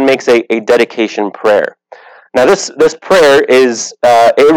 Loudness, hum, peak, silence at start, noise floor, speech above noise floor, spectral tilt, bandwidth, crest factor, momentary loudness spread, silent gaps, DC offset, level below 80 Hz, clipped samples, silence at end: -10 LUFS; none; 0 dBFS; 0 s; -37 dBFS; 28 dB; -3.5 dB/octave; 18 kHz; 8 dB; 8 LU; none; under 0.1%; -48 dBFS; under 0.1%; 0 s